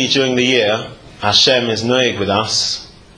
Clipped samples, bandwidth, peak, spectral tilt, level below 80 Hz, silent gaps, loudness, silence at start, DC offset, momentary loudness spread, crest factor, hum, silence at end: under 0.1%; 10.5 kHz; 0 dBFS; -3 dB/octave; -50 dBFS; none; -14 LUFS; 0 s; under 0.1%; 11 LU; 16 dB; none; 0.3 s